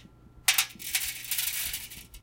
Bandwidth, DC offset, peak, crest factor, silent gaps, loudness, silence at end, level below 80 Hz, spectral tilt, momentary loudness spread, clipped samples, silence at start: 17.5 kHz; under 0.1%; -6 dBFS; 28 dB; none; -28 LUFS; 0.05 s; -56 dBFS; 1.5 dB/octave; 10 LU; under 0.1%; 0 s